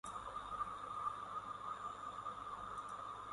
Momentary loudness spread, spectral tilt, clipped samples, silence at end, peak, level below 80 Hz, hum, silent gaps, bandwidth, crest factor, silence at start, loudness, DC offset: 4 LU; -3.5 dB/octave; under 0.1%; 0 s; -30 dBFS; -68 dBFS; 50 Hz at -65 dBFS; none; 11.5 kHz; 16 dB; 0.05 s; -46 LUFS; under 0.1%